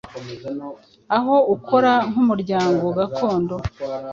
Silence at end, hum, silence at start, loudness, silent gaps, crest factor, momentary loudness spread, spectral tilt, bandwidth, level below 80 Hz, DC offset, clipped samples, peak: 0 s; none; 0.05 s; -19 LUFS; none; 16 dB; 15 LU; -7 dB/octave; 7.4 kHz; -48 dBFS; under 0.1%; under 0.1%; -4 dBFS